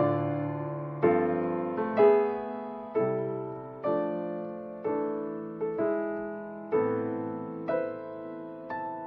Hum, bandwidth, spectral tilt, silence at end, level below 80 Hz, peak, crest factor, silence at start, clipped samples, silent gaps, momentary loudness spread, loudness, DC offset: none; 4.4 kHz; -7.5 dB/octave; 0 s; -70 dBFS; -10 dBFS; 20 dB; 0 s; under 0.1%; none; 13 LU; -30 LUFS; under 0.1%